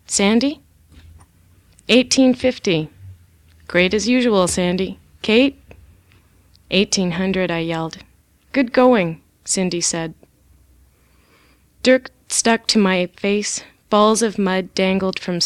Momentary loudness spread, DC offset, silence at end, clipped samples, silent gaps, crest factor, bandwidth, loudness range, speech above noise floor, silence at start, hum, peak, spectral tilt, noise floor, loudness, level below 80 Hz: 11 LU; under 0.1%; 0 s; under 0.1%; none; 18 dB; 13.5 kHz; 4 LU; 38 dB; 0.1 s; none; -2 dBFS; -4 dB/octave; -55 dBFS; -18 LUFS; -50 dBFS